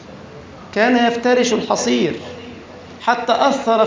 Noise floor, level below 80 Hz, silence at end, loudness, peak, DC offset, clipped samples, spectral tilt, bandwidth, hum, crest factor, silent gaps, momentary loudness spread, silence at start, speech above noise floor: -37 dBFS; -52 dBFS; 0 s; -17 LUFS; -2 dBFS; under 0.1%; under 0.1%; -3.5 dB/octave; 7.6 kHz; none; 16 dB; none; 22 LU; 0 s; 21 dB